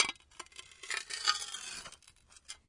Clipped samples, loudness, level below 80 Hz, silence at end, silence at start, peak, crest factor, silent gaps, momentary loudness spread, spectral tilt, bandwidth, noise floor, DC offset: under 0.1%; -35 LUFS; -70 dBFS; 0.1 s; 0 s; -8 dBFS; 30 dB; none; 18 LU; 1.5 dB/octave; 11.5 kHz; -62 dBFS; under 0.1%